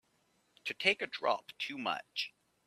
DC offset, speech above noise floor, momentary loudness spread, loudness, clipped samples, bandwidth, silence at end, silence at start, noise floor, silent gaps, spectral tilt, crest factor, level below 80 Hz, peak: under 0.1%; 38 dB; 11 LU; -35 LUFS; under 0.1%; 14 kHz; 0.4 s; 0.65 s; -74 dBFS; none; -2.5 dB/octave; 26 dB; -84 dBFS; -12 dBFS